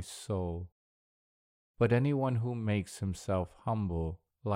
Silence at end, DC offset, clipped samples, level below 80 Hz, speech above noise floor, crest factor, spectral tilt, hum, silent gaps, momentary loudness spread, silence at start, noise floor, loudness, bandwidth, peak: 0 s; under 0.1%; under 0.1%; -52 dBFS; over 58 dB; 20 dB; -7 dB/octave; none; 0.72-1.74 s; 11 LU; 0 s; under -90 dBFS; -33 LUFS; 15 kHz; -14 dBFS